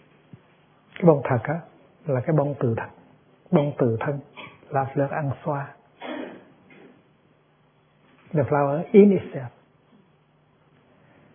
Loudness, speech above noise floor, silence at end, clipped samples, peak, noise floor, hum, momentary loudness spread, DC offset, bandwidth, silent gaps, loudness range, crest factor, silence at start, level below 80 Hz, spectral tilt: -23 LUFS; 39 dB; 1.85 s; under 0.1%; -2 dBFS; -61 dBFS; none; 20 LU; under 0.1%; 3.6 kHz; none; 8 LU; 24 dB; 1 s; -66 dBFS; -12.5 dB/octave